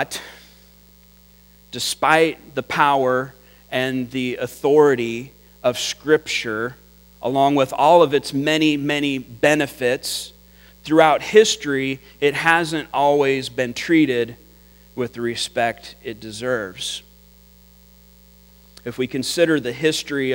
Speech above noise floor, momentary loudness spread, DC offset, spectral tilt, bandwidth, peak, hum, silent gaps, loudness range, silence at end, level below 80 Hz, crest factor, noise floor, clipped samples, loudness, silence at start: 31 dB; 15 LU; under 0.1%; -4 dB/octave; 16.5 kHz; 0 dBFS; none; none; 9 LU; 0 s; -54 dBFS; 20 dB; -50 dBFS; under 0.1%; -19 LUFS; 0 s